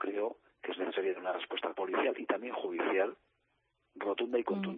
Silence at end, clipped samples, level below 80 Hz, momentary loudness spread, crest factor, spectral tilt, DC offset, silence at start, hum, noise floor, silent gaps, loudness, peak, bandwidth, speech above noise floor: 0 s; under 0.1%; -82 dBFS; 6 LU; 20 dB; -3 dB/octave; under 0.1%; 0 s; none; -78 dBFS; none; -35 LUFS; -16 dBFS; 4.1 kHz; 44 dB